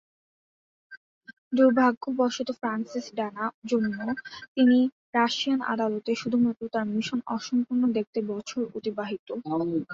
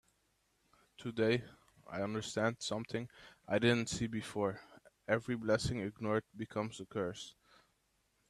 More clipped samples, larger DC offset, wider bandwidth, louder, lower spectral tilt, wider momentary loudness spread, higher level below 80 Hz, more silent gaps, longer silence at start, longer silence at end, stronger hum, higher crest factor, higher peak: neither; neither; second, 7.6 kHz vs 13 kHz; first, -27 LUFS vs -37 LUFS; about the same, -5 dB/octave vs -5 dB/octave; second, 11 LU vs 16 LU; about the same, -70 dBFS vs -66 dBFS; first, 0.97-1.21 s, 1.38-1.51 s, 1.97-2.01 s, 3.54-3.62 s, 4.48-4.55 s, 4.92-5.13 s, 8.07-8.13 s, 9.19-9.27 s vs none; about the same, 0.9 s vs 1 s; second, 0 s vs 1 s; neither; about the same, 18 dB vs 22 dB; first, -8 dBFS vs -18 dBFS